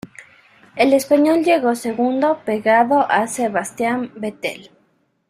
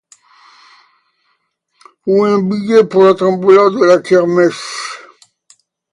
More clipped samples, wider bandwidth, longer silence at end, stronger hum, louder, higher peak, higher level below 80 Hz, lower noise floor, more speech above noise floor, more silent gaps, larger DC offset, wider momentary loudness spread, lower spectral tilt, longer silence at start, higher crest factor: neither; first, 16 kHz vs 11.5 kHz; second, 0.65 s vs 0.95 s; neither; second, -18 LUFS vs -11 LUFS; about the same, -2 dBFS vs 0 dBFS; about the same, -64 dBFS vs -60 dBFS; about the same, -63 dBFS vs -64 dBFS; second, 45 dB vs 54 dB; neither; neither; about the same, 13 LU vs 15 LU; second, -4.5 dB/octave vs -6 dB/octave; second, 0.05 s vs 2.05 s; about the same, 16 dB vs 14 dB